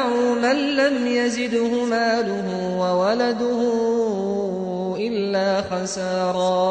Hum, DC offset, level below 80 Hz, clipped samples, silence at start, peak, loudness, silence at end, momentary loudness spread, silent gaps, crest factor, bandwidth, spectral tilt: none; under 0.1%; -58 dBFS; under 0.1%; 0 s; -8 dBFS; -21 LUFS; 0 s; 5 LU; none; 14 dB; 9.2 kHz; -5 dB/octave